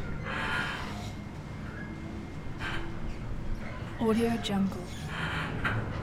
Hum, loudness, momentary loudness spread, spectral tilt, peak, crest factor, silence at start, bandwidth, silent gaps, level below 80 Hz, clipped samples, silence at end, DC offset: none; -34 LUFS; 11 LU; -6 dB/octave; -16 dBFS; 18 dB; 0 s; 15.5 kHz; none; -42 dBFS; under 0.1%; 0 s; under 0.1%